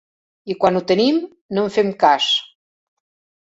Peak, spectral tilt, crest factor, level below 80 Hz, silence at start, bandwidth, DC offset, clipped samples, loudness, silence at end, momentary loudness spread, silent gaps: -2 dBFS; -5 dB/octave; 18 dB; -60 dBFS; 0.45 s; 8 kHz; under 0.1%; under 0.1%; -18 LUFS; 1 s; 9 LU; 1.41-1.49 s